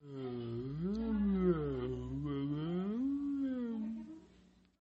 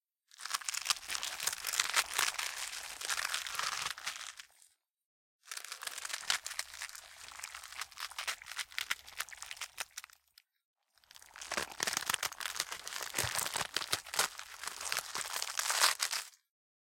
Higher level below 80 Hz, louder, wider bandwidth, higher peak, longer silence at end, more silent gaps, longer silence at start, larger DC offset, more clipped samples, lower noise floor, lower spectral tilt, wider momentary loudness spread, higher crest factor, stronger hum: first, -54 dBFS vs -72 dBFS; about the same, -38 LUFS vs -36 LUFS; second, 7.2 kHz vs 17 kHz; second, -20 dBFS vs -6 dBFS; about the same, 0.55 s vs 0.45 s; second, none vs 5.05-5.39 s, 10.65-10.74 s; second, 0.05 s vs 0.4 s; neither; neither; second, -65 dBFS vs -69 dBFS; first, -10 dB/octave vs 1 dB/octave; second, 10 LU vs 14 LU; second, 16 dB vs 32 dB; neither